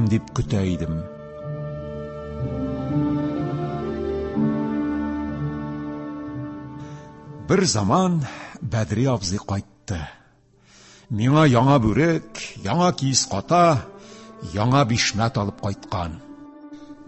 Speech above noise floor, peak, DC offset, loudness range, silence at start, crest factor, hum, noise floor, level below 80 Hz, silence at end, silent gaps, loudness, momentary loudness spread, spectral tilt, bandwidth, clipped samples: 35 dB; -4 dBFS; under 0.1%; 7 LU; 0 s; 20 dB; none; -56 dBFS; -42 dBFS; 0 s; none; -23 LUFS; 19 LU; -5.5 dB/octave; 8.6 kHz; under 0.1%